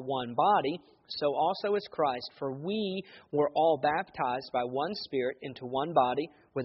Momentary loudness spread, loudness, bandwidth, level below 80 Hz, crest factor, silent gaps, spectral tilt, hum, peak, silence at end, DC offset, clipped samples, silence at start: 10 LU; -31 LUFS; 5.8 kHz; -72 dBFS; 20 dB; none; -3.5 dB/octave; none; -12 dBFS; 0 s; under 0.1%; under 0.1%; 0 s